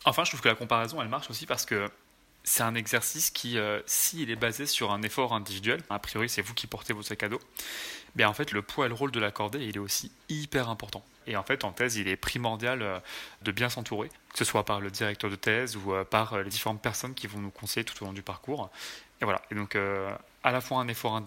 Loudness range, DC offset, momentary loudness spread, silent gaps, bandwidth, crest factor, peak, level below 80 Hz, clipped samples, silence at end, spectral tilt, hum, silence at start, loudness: 4 LU; under 0.1%; 11 LU; none; 16.5 kHz; 26 dB; -4 dBFS; -60 dBFS; under 0.1%; 0 s; -3 dB/octave; none; 0 s; -30 LUFS